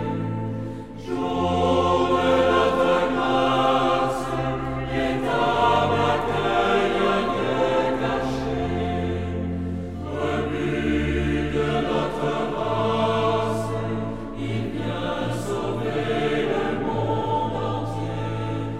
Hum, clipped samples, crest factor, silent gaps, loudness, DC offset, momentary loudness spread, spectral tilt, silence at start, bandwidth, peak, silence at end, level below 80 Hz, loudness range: none; under 0.1%; 16 dB; none; -23 LUFS; under 0.1%; 8 LU; -6.5 dB/octave; 0 s; 14.5 kHz; -8 dBFS; 0 s; -38 dBFS; 5 LU